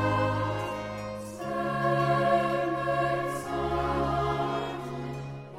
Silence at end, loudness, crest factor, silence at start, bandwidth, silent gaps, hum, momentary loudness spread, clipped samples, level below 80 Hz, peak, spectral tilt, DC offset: 0 s; -29 LUFS; 16 dB; 0 s; 16 kHz; none; none; 11 LU; under 0.1%; -48 dBFS; -12 dBFS; -6.5 dB/octave; under 0.1%